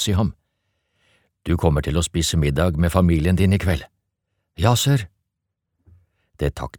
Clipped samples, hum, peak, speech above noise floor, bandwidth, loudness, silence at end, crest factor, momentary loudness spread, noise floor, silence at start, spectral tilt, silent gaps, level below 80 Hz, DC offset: under 0.1%; none; -2 dBFS; 61 dB; 18 kHz; -20 LUFS; 0 s; 20 dB; 9 LU; -79 dBFS; 0 s; -5.5 dB/octave; none; -34 dBFS; under 0.1%